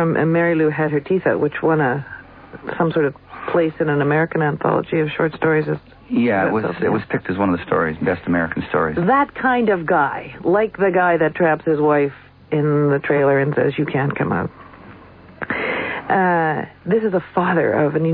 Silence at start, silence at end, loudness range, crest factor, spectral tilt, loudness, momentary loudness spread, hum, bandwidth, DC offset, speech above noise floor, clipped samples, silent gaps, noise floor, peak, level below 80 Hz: 0 s; 0 s; 3 LU; 14 dB; -11.5 dB/octave; -19 LUFS; 7 LU; none; 4.8 kHz; under 0.1%; 24 dB; under 0.1%; none; -42 dBFS; -4 dBFS; -52 dBFS